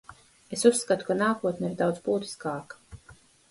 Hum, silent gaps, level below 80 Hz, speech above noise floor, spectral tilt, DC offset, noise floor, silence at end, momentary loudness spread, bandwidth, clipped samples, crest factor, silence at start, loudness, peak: none; none; -62 dBFS; 29 dB; -4.5 dB/octave; under 0.1%; -55 dBFS; 0.4 s; 15 LU; 11.5 kHz; under 0.1%; 22 dB; 0.1 s; -27 LUFS; -6 dBFS